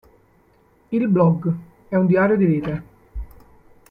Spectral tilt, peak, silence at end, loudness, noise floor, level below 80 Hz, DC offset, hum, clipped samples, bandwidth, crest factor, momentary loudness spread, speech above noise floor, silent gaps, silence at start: -11 dB/octave; -4 dBFS; 0.65 s; -19 LUFS; -57 dBFS; -42 dBFS; under 0.1%; none; under 0.1%; 4.7 kHz; 16 dB; 21 LU; 39 dB; none; 0.9 s